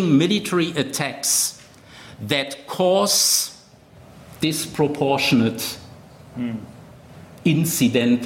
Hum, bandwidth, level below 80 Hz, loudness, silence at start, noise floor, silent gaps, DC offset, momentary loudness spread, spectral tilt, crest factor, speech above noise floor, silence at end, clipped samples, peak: none; 16.5 kHz; -58 dBFS; -20 LUFS; 0 s; -47 dBFS; none; under 0.1%; 13 LU; -3.5 dB/octave; 16 dB; 28 dB; 0 s; under 0.1%; -6 dBFS